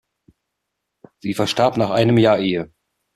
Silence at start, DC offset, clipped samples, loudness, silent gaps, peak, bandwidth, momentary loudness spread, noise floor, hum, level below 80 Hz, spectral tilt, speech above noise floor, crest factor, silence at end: 1.25 s; under 0.1%; under 0.1%; -18 LUFS; none; -2 dBFS; 14 kHz; 13 LU; -78 dBFS; none; -54 dBFS; -6 dB/octave; 61 dB; 18 dB; 0.5 s